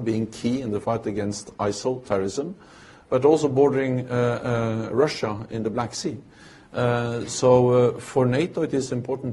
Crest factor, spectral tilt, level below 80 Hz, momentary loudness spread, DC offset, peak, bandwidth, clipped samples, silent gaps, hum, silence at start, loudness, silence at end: 20 dB; -6 dB/octave; -56 dBFS; 10 LU; under 0.1%; -4 dBFS; 11.5 kHz; under 0.1%; none; none; 0 s; -23 LUFS; 0 s